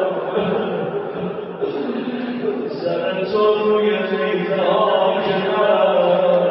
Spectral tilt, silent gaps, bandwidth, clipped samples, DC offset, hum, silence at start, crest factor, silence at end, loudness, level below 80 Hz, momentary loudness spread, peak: -10.5 dB/octave; none; 5.8 kHz; under 0.1%; under 0.1%; none; 0 s; 14 dB; 0 s; -19 LUFS; -64 dBFS; 9 LU; -4 dBFS